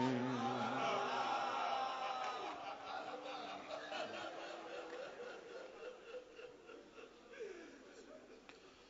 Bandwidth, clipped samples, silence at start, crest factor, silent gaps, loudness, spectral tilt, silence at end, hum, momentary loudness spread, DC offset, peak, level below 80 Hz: 7.6 kHz; under 0.1%; 0 s; 18 dB; none; -44 LUFS; -2.5 dB/octave; 0 s; none; 19 LU; under 0.1%; -26 dBFS; -82 dBFS